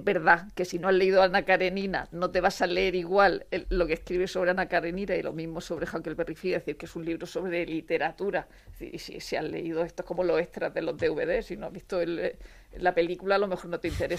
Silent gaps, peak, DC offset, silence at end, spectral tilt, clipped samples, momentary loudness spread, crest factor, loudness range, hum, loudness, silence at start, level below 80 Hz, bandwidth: none; -6 dBFS; under 0.1%; 0 s; -5.5 dB/octave; under 0.1%; 12 LU; 22 dB; 7 LU; none; -28 LUFS; 0 s; -48 dBFS; 15 kHz